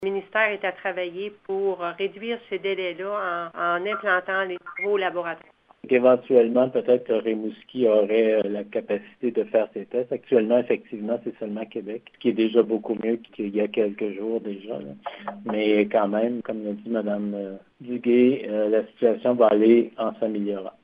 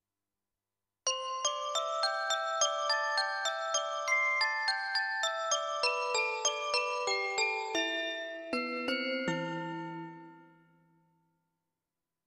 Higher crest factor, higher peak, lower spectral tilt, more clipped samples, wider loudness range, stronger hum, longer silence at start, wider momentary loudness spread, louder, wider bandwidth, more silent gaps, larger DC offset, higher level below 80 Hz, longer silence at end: about the same, 18 dB vs 20 dB; first, -4 dBFS vs -14 dBFS; first, -9 dB/octave vs -1 dB/octave; neither; about the same, 5 LU vs 7 LU; neither; second, 0 s vs 1.05 s; first, 13 LU vs 8 LU; first, -24 LUFS vs -32 LUFS; second, 5 kHz vs 13.5 kHz; neither; neither; about the same, -74 dBFS vs -78 dBFS; second, 0.15 s vs 1.8 s